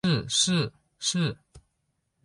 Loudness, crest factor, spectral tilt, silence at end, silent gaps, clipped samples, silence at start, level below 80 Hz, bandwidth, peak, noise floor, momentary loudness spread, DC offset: -26 LUFS; 18 dB; -3.5 dB/octave; 0.65 s; none; under 0.1%; 0.05 s; -58 dBFS; 11.5 kHz; -10 dBFS; -76 dBFS; 10 LU; under 0.1%